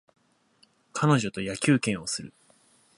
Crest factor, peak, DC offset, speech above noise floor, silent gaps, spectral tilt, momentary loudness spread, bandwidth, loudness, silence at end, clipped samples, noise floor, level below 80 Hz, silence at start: 20 dB; -8 dBFS; under 0.1%; 39 dB; none; -5 dB/octave; 12 LU; 11.5 kHz; -26 LUFS; 0.7 s; under 0.1%; -64 dBFS; -62 dBFS; 0.95 s